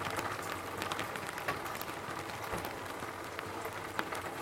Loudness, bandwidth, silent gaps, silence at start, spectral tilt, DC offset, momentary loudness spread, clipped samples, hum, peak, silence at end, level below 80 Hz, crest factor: -39 LUFS; 16.5 kHz; none; 0 s; -3.5 dB/octave; under 0.1%; 4 LU; under 0.1%; none; -14 dBFS; 0 s; -62 dBFS; 26 dB